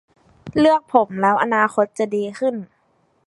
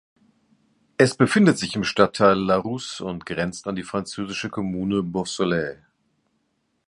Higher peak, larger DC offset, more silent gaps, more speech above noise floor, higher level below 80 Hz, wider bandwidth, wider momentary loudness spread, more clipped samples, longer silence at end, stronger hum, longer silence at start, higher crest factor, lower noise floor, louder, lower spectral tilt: about the same, -2 dBFS vs 0 dBFS; neither; neither; second, 45 dB vs 50 dB; about the same, -56 dBFS vs -54 dBFS; about the same, 11.5 kHz vs 11.5 kHz; second, 8 LU vs 12 LU; neither; second, 0.6 s vs 1.15 s; neither; second, 0.45 s vs 1 s; about the same, 18 dB vs 22 dB; second, -63 dBFS vs -71 dBFS; first, -19 LUFS vs -22 LUFS; about the same, -6 dB/octave vs -5.5 dB/octave